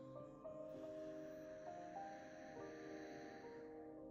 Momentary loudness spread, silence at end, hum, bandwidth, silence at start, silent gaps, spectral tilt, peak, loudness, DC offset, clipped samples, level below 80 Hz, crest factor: 4 LU; 0 s; none; 15 kHz; 0 s; none; -6 dB/octave; -42 dBFS; -54 LUFS; under 0.1%; under 0.1%; -80 dBFS; 12 dB